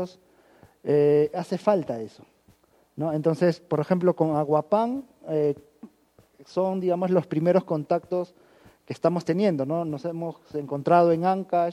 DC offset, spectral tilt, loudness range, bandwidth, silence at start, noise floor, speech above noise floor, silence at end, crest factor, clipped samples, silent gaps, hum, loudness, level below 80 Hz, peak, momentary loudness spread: under 0.1%; -8.5 dB/octave; 2 LU; 12.5 kHz; 0 s; -60 dBFS; 36 dB; 0 s; 20 dB; under 0.1%; none; none; -25 LUFS; -70 dBFS; -6 dBFS; 14 LU